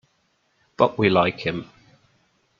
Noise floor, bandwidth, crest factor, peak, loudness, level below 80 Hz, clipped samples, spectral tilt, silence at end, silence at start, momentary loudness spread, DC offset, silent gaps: -67 dBFS; 7.2 kHz; 22 dB; -2 dBFS; -21 LUFS; -60 dBFS; under 0.1%; -7.5 dB/octave; 0.95 s; 0.8 s; 10 LU; under 0.1%; none